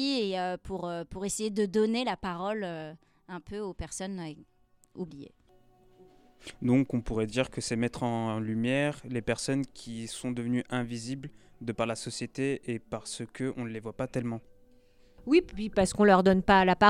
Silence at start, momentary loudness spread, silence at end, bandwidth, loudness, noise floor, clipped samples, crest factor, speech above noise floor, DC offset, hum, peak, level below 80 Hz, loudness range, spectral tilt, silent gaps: 0 s; 17 LU; 0 s; 13.5 kHz; -30 LUFS; -61 dBFS; under 0.1%; 22 dB; 31 dB; under 0.1%; none; -8 dBFS; -52 dBFS; 9 LU; -5 dB/octave; none